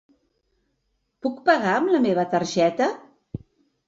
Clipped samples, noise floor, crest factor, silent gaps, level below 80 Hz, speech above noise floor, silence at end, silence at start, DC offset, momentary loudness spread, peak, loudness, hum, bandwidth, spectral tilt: under 0.1%; -73 dBFS; 20 dB; none; -60 dBFS; 52 dB; 0.5 s; 1.25 s; under 0.1%; 20 LU; -4 dBFS; -22 LUFS; none; 8 kHz; -5.5 dB/octave